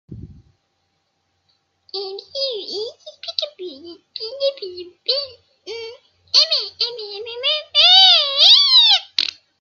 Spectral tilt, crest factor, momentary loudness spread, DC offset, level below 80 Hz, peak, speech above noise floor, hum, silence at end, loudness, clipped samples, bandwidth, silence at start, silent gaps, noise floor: -0.5 dB/octave; 20 dB; 24 LU; under 0.1%; -60 dBFS; 0 dBFS; 42 dB; none; 0.3 s; -13 LUFS; under 0.1%; 7.4 kHz; 0.1 s; none; -69 dBFS